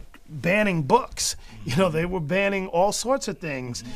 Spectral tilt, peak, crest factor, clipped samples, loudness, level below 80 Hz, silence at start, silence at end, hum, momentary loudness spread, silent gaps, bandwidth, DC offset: -4.5 dB/octave; -6 dBFS; 18 dB; under 0.1%; -24 LUFS; -46 dBFS; 0 s; 0 s; none; 9 LU; none; 15.5 kHz; under 0.1%